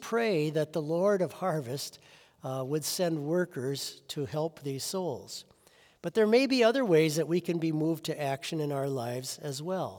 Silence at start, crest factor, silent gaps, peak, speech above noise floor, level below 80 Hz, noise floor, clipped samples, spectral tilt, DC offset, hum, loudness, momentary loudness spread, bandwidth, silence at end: 0 s; 18 dB; none; -12 dBFS; 32 dB; -78 dBFS; -62 dBFS; under 0.1%; -5 dB/octave; under 0.1%; none; -30 LUFS; 12 LU; over 20 kHz; 0 s